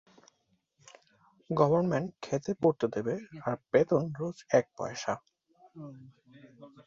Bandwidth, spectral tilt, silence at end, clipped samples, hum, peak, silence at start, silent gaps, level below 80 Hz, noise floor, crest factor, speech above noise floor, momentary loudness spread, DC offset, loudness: 7.6 kHz; -7 dB/octave; 0.05 s; under 0.1%; none; -10 dBFS; 1.5 s; none; -68 dBFS; -75 dBFS; 22 dB; 45 dB; 13 LU; under 0.1%; -30 LUFS